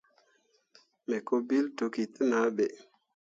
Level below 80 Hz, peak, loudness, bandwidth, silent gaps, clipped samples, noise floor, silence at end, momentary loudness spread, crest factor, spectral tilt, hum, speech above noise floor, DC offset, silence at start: -80 dBFS; -14 dBFS; -31 LUFS; 7.8 kHz; none; under 0.1%; -71 dBFS; 0.45 s; 8 LU; 18 dB; -5.5 dB/octave; none; 41 dB; under 0.1%; 1.1 s